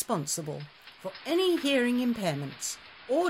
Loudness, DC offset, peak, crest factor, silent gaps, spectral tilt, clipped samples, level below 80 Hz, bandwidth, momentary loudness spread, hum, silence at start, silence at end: -29 LUFS; under 0.1%; -16 dBFS; 14 dB; none; -4 dB/octave; under 0.1%; -68 dBFS; 16 kHz; 16 LU; none; 0 s; 0 s